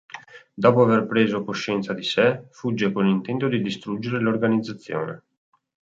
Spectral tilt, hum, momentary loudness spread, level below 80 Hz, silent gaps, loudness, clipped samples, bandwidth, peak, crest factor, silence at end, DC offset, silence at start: -6.5 dB/octave; none; 12 LU; -64 dBFS; none; -22 LUFS; under 0.1%; 7.8 kHz; -4 dBFS; 20 dB; 0.65 s; under 0.1%; 0.15 s